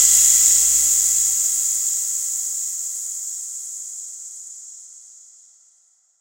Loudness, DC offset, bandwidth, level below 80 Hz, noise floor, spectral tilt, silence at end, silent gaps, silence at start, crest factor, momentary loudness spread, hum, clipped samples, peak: -16 LUFS; under 0.1%; 16 kHz; -54 dBFS; -59 dBFS; 3.5 dB/octave; 1.15 s; none; 0 s; 20 dB; 22 LU; none; under 0.1%; 0 dBFS